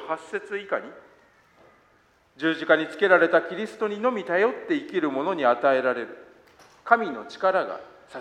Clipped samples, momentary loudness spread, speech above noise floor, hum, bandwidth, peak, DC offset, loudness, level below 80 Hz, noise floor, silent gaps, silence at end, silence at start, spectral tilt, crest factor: under 0.1%; 12 LU; 37 dB; none; 10 kHz; -2 dBFS; under 0.1%; -24 LUFS; -72 dBFS; -61 dBFS; none; 0 s; 0 s; -5.5 dB/octave; 22 dB